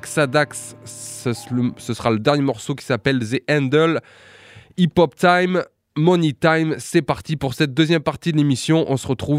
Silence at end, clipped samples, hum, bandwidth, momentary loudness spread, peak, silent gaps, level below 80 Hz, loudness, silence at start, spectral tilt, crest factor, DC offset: 0 s; under 0.1%; none; 15.5 kHz; 10 LU; -2 dBFS; none; -52 dBFS; -19 LUFS; 0.05 s; -6 dB/octave; 16 dB; under 0.1%